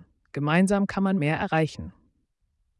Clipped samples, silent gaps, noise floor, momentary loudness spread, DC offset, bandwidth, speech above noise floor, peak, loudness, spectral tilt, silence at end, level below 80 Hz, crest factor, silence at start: under 0.1%; none; -72 dBFS; 17 LU; under 0.1%; 12 kHz; 48 dB; -10 dBFS; -24 LUFS; -6.5 dB/octave; 0.9 s; -56 dBFS; 16 dB; 0.35 s